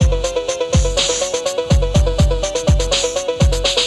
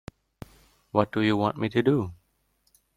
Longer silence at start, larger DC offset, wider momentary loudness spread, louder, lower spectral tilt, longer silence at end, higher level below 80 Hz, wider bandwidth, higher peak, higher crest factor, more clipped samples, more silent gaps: second, 0 s vs 0.95 s; neither; about the same, 4 LU vs 5 LU; first, -17 LUFS vs -26 LUFS; second, -4 dB/octave vs -7.5 dB/octave; second, 0 s vs 0.8 s; first, -20 dBFS vs -58 dBFS; second, 12.5 kHz vs 14 kHz; about the same, -2 dBFS vs -4 dBFS; second, 14 dB vs 24 dB; neither; neither